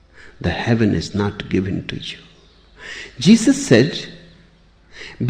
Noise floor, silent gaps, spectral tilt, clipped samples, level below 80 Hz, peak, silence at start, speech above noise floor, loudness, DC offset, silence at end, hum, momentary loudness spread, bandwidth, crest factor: -51 dBFS; none; -5.5 dB/octave; under 0.1%; -44 dBFS; -2 dBFS; 0.2 s; 34 dB; -18 LUFS; under 0.1%; 0 s; none; 22 LU; 10 kHz; 18 dB